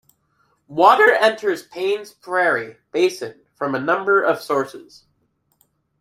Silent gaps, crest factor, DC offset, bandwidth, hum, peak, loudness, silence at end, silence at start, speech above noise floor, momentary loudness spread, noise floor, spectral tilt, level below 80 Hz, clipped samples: none; 20 dB; under 0.1%; 15.5 kHz; none; 0 dBFS; -18 LUFS; 1.2 s; 0.7 s; 48 dB; 15 LU; -67 dBFS; -4 dB/octave; -70 dBFS; under 0.1%